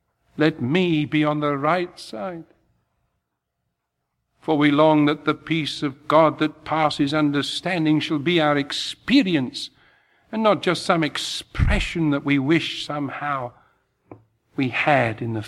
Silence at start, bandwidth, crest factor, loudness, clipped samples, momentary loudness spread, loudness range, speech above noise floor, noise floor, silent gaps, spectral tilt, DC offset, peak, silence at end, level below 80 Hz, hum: 0.35 s; 12.5 kHz; 20 dB; -21 LUFS; under 0.1%; 13 LU; 4 LU; 57 dB; -78 dBFS; none; -5.5 dB/octave; under 0.1%; -2 dBFS; 0 s; -38 dBFS; none